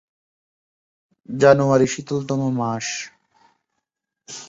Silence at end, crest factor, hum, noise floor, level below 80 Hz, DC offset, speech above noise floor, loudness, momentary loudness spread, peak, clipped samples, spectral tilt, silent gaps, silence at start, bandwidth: 0.05 s; 20 dB; none; -80 dBFS; -60 dBFS; under 0.1%; 61 dB; -19 LUFS; 18 LU; -2 dBFS; under 0.1%; -5.5 dB/octave; none; 1.3 s; 8 kHz